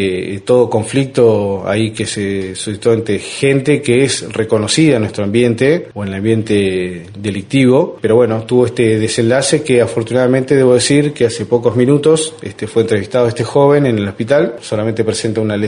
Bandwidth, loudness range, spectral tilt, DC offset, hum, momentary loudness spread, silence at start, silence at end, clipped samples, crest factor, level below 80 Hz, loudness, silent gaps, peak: 11 kHz; 2 LU; -5.5 dB/octave; under 0.1%; none; 8 LU; 0 s; 0 s; under 0.1%; 12 dB; -50 dBFS; -13 LUFS; none; 0 dBFS